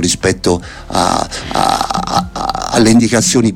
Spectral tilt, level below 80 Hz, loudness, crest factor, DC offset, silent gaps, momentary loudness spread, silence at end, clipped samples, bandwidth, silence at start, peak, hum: -4 dB/octave; -32 dBFS; -13 LUFS; 14 dB; under 0.1%; none; 9 LU; 0 s; under 0.1%; 16.5 kHz; 0 s; 0 dBFS; none